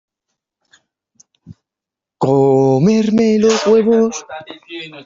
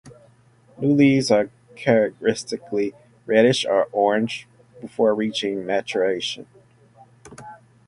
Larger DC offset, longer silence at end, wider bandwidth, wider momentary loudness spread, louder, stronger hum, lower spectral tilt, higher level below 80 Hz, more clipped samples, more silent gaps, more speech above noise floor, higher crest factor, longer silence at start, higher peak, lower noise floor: neither; second, 0.05 s vs 0.3 s; second, 7.6 kHz vs 11.5 kHz; about the same, 18 LU vs 17 LU; first, -13 LUFS vs -21 LUFS; neither; about the same, -6 dB/octave vs -5.5 dB/octave; first, -56 dBFS vs -62 dBFS; neither; neither; first, 72 dB vs 35 dB; second, 14 dB vs 20 dB; first, 1.5 s vs 0.05 s; about the same, -2 dBFS vs -2 dBFS; first, -85 dBFS vs -55 dBFS